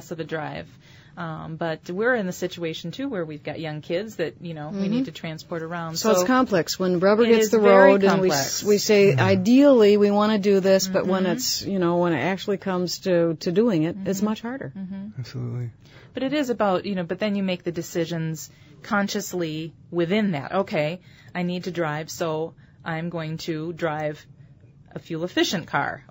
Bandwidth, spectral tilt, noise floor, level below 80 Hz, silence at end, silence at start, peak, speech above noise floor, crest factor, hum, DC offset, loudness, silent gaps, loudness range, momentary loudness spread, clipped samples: 16.5 kHz; -5 dB/octave; -50 dBFS; -60 dBFS; 0.1 s; 0 s; -2 dBFS; 27 dB; 20 dB; none; under 0.1%; -22 LUFS; none; 11 LU; 16 LU; under 0.1%